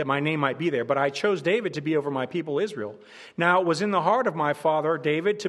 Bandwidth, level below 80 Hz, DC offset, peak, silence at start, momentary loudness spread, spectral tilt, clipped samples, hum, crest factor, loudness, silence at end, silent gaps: 12 kHz; -74 dBFS; under 0.1%; -6 dBFS; 0 s; 7 LU; -6 dB/octave; under 0.1%; none; 18 dB; -25 LUFS; 0 s; none